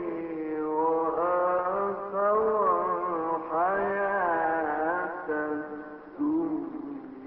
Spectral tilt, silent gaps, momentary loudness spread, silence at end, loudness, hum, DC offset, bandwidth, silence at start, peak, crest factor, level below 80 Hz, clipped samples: -10.5 dB/octave; none; 9 LU; 0 s; -28 LUFS; none; under 0.1%; 4.2 kHz; 0 s; -14 dBFS; 14 dB; -64 dBFS; under 0.1%